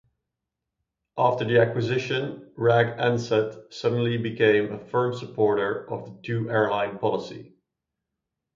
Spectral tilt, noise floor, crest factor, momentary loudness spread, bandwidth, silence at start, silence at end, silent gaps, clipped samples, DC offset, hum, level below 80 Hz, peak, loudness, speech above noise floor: -7 dB/octave; -85 dBFS; 20 dB; 11 LU; 7.6 kHz; 1.15 s; 1.1 s; none; under 0.1%; under 0.1%; none; -64 dBFS; -6 dBFS; -25 LUFS; 60 dB